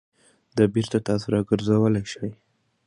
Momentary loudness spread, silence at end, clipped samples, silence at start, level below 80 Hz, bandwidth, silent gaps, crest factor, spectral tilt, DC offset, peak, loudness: 12 LU; 0.5 s; under 0.1%; 0.55 s; -54 dBFS; 11 kHz; none; 18 dB; -7 dB/octave; under 0.1%; -6 dBFS; -23 LUFS